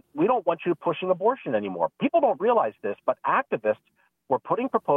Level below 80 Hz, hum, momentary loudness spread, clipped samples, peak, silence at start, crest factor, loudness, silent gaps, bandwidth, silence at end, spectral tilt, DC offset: -74 dBFS; none; 6 LU; under 0.1%; -8 dBFS; 0.15 s; 16 dB; -25 LUFS; none; 3.8 kHz; 0 s; -9 dB/octave; under 0.1%